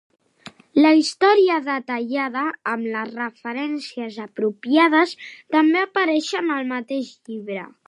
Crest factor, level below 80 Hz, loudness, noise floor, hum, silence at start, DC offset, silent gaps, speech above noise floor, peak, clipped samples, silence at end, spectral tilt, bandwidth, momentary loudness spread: 16 dB; -78 dBFS; -20 LUFS; -46 dBFS; none; 0.45 s; under 0.1%; none; 25 dB; -4 dBFS; under 0.1%; 0.2 s; -4 dB/octave; 11 kHz; 15 LU